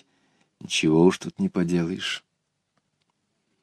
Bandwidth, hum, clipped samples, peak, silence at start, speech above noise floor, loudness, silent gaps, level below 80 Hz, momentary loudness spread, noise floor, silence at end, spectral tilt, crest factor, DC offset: 11 kHz; 50 Hz at -65 dBFS; under 0.1%; -6 dBFS; 0.65 s; 52 dB; -24 LUFS; none; -60 dBFS; 10 LU; -75 dBFS; 1.45 s; -5 dB/octave; 20 dB; under 0.1%